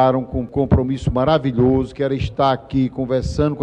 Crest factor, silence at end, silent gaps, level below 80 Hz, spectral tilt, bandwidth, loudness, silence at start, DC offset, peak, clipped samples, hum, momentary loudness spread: 16 dB; 0 s; none; -32 dBFS; -8 dB/octave; 9 kHz; -19 LUFS; 0 s; under 0.1%; -2 dBFS; under 0.1%; none; 5 LU